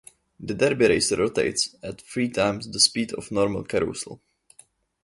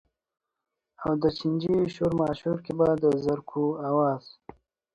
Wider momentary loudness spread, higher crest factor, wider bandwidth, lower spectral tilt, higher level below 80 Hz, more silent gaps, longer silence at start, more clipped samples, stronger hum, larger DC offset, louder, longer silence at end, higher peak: first, 14 LU vs 6 LU; about the same, 20 dB vs 18 dB; first, 12 kHz vs 9.8 kHz; second, -3 dB/octave vs -8.5 dB/octave; about the same, -54 dBFS vs -58 dBFS; neither; second, 0.4 s vs 1 s; neither; neither; neither; first, -23 LUFS vs -27 LUFS; first, 0.9 s vs 0.65 s; first, -4 dBFS vs -10 dBFS